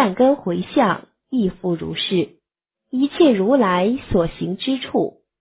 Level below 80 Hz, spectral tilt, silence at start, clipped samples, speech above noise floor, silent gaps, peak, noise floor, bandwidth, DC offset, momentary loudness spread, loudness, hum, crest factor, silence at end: -46 dBFS; -10.5 dB/octave; 0 s; under 0.1%; 63 dB; none; -4 dBFS; -82 dBFS; 4 kHz; under 0.1%; 9 LU; -20 LUFS; none; 16 dB; 0.3 s